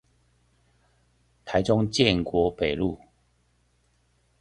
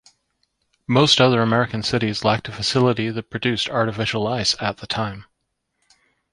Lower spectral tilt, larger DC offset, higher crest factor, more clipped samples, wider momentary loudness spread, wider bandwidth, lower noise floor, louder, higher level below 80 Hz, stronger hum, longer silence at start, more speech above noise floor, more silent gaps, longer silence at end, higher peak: about the same, -5.5 dB/octave vs -4.5 dB/octave; neither; about the same, 24 dB vs 20 dB; neither; about the same, 11 LU vs 10 LU; about the same, 11 kHz vs 11.5 kHz; second, -67 dBFS vs -75 dBFS; second, -24 LUFS vs -20 LUFS; about the same, -48 dBFS vs -52 dBFS; neither; first, 1.45 s vs 0.9 s; second, 43 dB vs 55 dB; neither; first, 1.45 s vs 1.1 s; about the same, -4 dBFS vs -2 dBFS